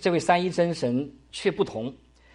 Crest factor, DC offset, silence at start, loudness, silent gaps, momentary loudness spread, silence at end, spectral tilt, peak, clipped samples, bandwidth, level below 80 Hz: 20 dB; under 0.1%; 0 s; -26 LUFS; none; 13 LU; 0.4 s; -5.5 dB/octave; -6 dBFS; under 0.1%; 11.5 kHz; -58 dBFS